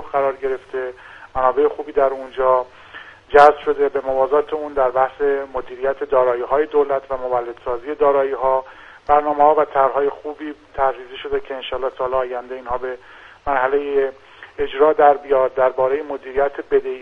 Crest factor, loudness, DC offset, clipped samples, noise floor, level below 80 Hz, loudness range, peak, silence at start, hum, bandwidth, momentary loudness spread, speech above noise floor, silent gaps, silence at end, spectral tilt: 18 dB; -19 LUFS; under 0.1%; under 0.1%; -40 dBFS; -46 dBFS; 6 LU; 0 dBFS; 0 s; none; 6.6 kHz; 14 LU; 22 dB; none; 0 s; -6 dB/octave